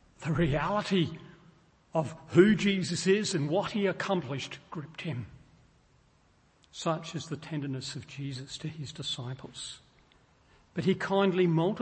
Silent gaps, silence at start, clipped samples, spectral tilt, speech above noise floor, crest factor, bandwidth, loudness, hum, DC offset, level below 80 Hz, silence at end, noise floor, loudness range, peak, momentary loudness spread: none; 0.2 s; under 0.1%; -5.5 dB/octave; 36 dB; 22 dB; 8.8 kHz; -30 LUFS; none; under 0.1%; -56 dBFS; 0 s; -65 dBFS; 10 LU; -8 dBFS; 15 LU